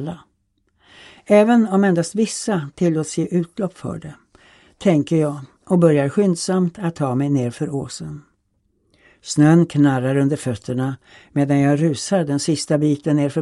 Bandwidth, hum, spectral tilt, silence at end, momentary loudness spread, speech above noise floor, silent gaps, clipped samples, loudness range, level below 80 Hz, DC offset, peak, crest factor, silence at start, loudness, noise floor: 12 kHz; none; -6.5 dB/octave; 0 s; 16 LU; 48 dB; none; under 0.1%; 4 LU; -58 dBFS; under 0.1%; 0 dBFS; 18 dB; 0 s; -19 LUFS; -66 dBFS